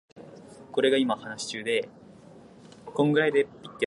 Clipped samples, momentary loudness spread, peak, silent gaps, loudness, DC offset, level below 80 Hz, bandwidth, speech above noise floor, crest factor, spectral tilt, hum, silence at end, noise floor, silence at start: under 0.1%; 24 LU; -10 dBFS; none; -26 LUFS; under 0.1%; -70 dBFS; 11.5 kHz; 24 dB; 18 dB; -5 dB/octave; none; 0 s; -50 dBFS; 0.15 s